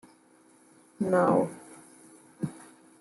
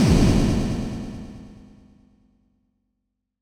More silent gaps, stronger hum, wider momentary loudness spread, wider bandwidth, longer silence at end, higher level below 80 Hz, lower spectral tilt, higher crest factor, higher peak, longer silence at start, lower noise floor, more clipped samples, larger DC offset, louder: neither; neither; first, 27 LU vs 22 LU; second, 12 kHz vs 16 kHz; second, 0.4 s vs 1.9 s; second, -74 dBFS vs -30 dBFS; about the same, -7.5 dB/octave vs -6.5 dB/octave; about the same, 20 dB vs 18 dB; second, -12 dBFS vs -6 dBFS; first, 1 s vs 0 s; second, -60 dBFS vs -78 dBFS; neither; neither; second, -28 LUFS vs -22 LUFS